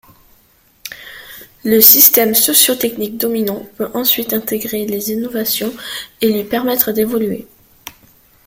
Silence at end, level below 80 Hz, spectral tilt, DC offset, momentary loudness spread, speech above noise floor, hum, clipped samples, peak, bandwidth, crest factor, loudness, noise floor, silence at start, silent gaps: 0.55 s; -54 dBFS; -2.5 dB/octave; under 0.1%; 22 LU; 38 dB; none; 0.3%; 0 dBFS; over 20 kHz; 16 dB; -12 LUFS; -53 dBFS; 0.85 s; none